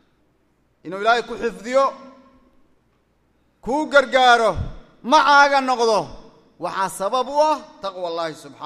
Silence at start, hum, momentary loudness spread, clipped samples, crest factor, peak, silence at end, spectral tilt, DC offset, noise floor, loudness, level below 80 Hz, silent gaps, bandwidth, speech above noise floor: 0.85 s; none; 18 LU; under 0.1%; 20 dB; 0 dBFS; 0 s; -3.5 dB/octave; under 0.1%; -63 dBFS; -18 LUFS; -46 dBFS; none; 14 kHz; 44 dB